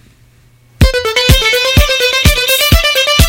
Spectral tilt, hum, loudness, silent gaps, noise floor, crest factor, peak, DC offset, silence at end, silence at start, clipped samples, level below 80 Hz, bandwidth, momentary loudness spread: -3.5 dB/octave; none; -9 LUFS; none; -46 dBFS; 10 dB; 0 dBFS; under 0.1%; 0 s; 0.8 s; 0.5%; -18 dBFS; 17.5 kHz; 3 LU